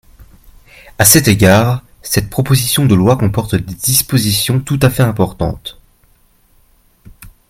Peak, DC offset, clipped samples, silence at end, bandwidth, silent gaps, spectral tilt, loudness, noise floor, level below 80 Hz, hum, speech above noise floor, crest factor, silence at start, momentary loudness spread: 0 dBFS; under 0.1%; 0.1%; 0.25 s; over 20 kHz; none; -4.5 dB/octave; -12 LUFS; -51 dBFS; -36 dBFS; none; 40 dB; 14 dB; 0.2 s; 11 LU